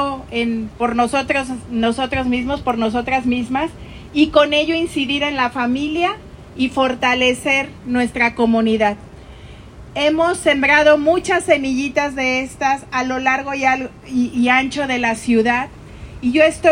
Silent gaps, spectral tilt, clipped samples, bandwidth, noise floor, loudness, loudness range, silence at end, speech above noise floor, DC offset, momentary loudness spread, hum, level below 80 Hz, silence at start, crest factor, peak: none; -4 dB/octave; under 0.1%; 15.5 kHz; -37 dBFS; -17 LUFS; 3 LU; 0 s; 20 dB; under 0.1%; 8 LU; none; -42 dBFS; 0 s; 18 dB; 0 dBFS